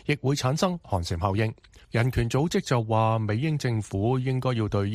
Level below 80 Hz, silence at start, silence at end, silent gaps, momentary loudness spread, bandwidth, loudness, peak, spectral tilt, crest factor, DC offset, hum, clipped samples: -46 dBFS; 0.05 s; 0 s; none; 4 LU; 14.5 kHz; -26 LUFS; -8 dBFS; -6.5 dB/octave; 18 dB; under 0.1%; none; under 0.1%